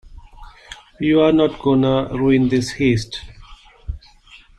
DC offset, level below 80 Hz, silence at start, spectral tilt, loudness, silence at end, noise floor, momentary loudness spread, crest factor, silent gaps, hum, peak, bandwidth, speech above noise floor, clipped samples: under 0.1%; -40 dBFS; 0.05 s; -6.5 dB/octave; -17 LUFS; 0.25 s; -47 dBFS; 22 LU; 16 dB; none; none; -4 dBFS; 11 kHz; 30 dB; under 0.1%